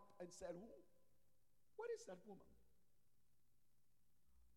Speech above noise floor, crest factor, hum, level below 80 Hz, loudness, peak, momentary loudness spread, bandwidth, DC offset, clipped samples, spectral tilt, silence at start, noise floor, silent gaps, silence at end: 29 dB; 18 dB; none; -82 dBFS; -56 LUFS; -42 dBFS; 13 LU; 15 kHz; under 0.1%; under 0.1%; -4.5 dB/octave; 0 s; -84 dBFS; none; 0 s